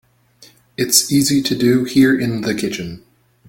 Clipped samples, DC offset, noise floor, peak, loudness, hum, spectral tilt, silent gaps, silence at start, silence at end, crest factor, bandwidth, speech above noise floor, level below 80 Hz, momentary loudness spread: under 0.1%; under 0.1%; -49 dBFS; 0 dBFS; -15 LUFS; none; -3.5 dB/octave; none; 0.8 s; 0.5 s; 18 dB; 17 kHz; 33 dB; -52 dBFS; 13 LU